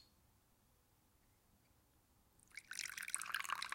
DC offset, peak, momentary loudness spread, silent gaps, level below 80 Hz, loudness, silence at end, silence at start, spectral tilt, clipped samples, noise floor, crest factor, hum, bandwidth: under 0.1%; -18 dBFS; 14 LU; none; -80 dBFS; -44 LUFS; 0 s; 0 s; 1.5 dB/octave; under 0.1%; -75 dBFS; 34 dB; none; 16.5 kHz